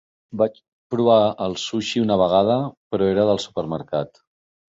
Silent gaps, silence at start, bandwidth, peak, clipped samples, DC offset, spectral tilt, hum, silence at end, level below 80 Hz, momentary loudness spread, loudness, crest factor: 0.68-0.90 s, 2.77-2.90 s; 0.3 s; 8 kHz; -2 dBFS; under 0.1%; under 0.1%; -6 dB/octave; none; 0.6 s; -54 dBFS; 10 LU; -21 LUFS; 18 dB